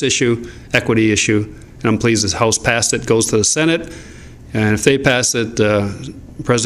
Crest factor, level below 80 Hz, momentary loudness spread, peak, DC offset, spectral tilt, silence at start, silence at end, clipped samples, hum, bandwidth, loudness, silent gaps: 16 dB; -40 dBFS; 12 LU; 0 dBFS; under 0.1%; -3.5 dB/octave; 0 s; 0 s; under 0.1%; none; 15 kHz; -15 LUFS; none